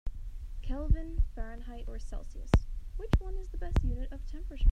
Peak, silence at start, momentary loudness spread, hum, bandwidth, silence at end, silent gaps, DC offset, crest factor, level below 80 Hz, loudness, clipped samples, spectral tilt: -12 dBFS; 0.05 s; 15 LU; none; 8.6 kHz; 0 s; none; under 0.1%; 20 dB; -32 dBFS; -36 LUFS; under 0.1%; -7.5 dB/octave